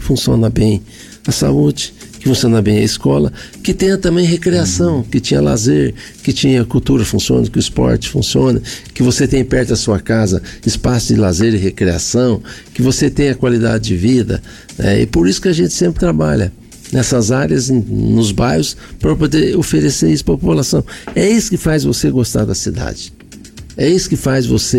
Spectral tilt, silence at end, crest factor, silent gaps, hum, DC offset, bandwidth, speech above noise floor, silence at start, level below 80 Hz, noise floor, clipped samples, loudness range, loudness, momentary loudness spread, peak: -5.5 dB/octave; 0 s; 10 dB; none; none; under 0.1%; 17 kHz; 21 dB; 0 s; -30 dBFS; -34 dBFS; under 0.1%; 1 LU; -14 LUFS; 7 LU; -4 dBFS